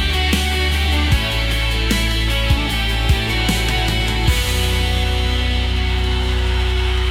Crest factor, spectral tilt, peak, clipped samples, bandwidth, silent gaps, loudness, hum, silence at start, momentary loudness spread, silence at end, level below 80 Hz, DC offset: 14 dB; -4.5 dB/octave; -2 dBFS; under 0.1%; 16.5 kHz; none; -18 LUFS; none; 0 s; 2 LU; 0 s; -20 dBFS; under 0.1%